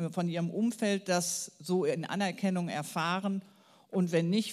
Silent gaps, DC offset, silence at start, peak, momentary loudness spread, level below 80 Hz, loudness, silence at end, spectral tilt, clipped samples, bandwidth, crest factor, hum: none; under 0.1%; 0 s; -16 dBFS; 6 LU; -86 dBFS; -32 LUFS; 0 s; -5 dB/octave; under 0.1%; 14.5 kHz; 16 dB; none